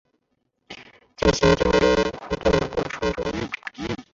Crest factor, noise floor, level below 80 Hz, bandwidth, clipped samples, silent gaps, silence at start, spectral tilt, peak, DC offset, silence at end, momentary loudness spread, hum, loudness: 20 dB; -73 dBFS; -38 dBFS; 7.8 kHz; under 0.1%; none; 0.7 s; -5 dB/octave; -4 dBFS; under 0.1%; 0.1 s; 22 LU; none; -22 LUFS